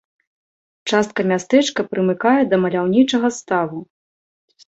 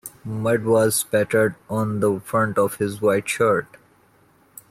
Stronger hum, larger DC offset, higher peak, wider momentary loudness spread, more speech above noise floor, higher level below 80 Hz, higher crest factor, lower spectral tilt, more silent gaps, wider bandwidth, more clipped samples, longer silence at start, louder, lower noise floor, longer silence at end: neither; neither; first, -2 dBFS vs -8 dBFS; about the same, 6 LU vs 7 LU; first, over 73 dB vs 37 dB; about the same, -60 dBFS vs -60 dBFS; about the same, 18 dB vs 14 dB; about the same, -5 dB/octave vs -5 dB/octave; neither; second, 8.2 kHz vs 16 kHz; neither; first, 0.85 s vs 0.05 s; first, -18 LUFS vs -21 LUFS; first, under -90 dBFS vs -57 dBFS; second, 0.85 s vs 1.05 s